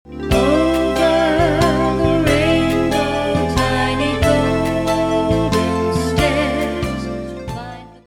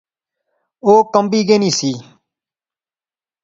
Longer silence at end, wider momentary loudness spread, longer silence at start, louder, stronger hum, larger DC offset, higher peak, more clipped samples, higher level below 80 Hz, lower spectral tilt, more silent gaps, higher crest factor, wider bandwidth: second, 0.2 s vs 1.4 s; about the same, 10 LU vs 10 LU; second, 0.05 s vs 0.85 s; second, -17 LUFS vs -14 LUFS; neither; neither; about the same, -2 dBFS vs 0 dBFS; neither; first, -30 dBFS vs -64 dBFS; first, -6 dB/octave vs -4.5 dB/octave; neither; about the same, 14 dB vs 18 dB; first, 17 kHz vs 7.8 kHz